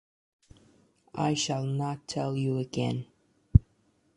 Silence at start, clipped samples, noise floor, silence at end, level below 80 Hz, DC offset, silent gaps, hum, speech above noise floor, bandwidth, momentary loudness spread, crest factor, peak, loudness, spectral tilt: 1.15 s; under 0.1%; -69 dBFS; 0.55 s; -40 dBFS; under 0.1%; none; none; 39 dB; 11 kHz; 10 LU; 26 dB; -4 dBFS; -29 LUFS; -6 dB/octave